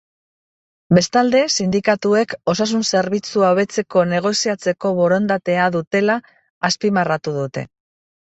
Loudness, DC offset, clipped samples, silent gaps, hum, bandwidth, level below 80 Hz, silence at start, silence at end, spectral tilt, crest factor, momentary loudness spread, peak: -18 LUFS; under 0.1%; under 0.1%; 5.87-5.91 s, 6.50-6.61 s; none; 8.2 kHz; -58 dBFS; 0.9 s; 0.65 s; -4.5 dB/octave; 16 dB; 7 LU; -2 dBFS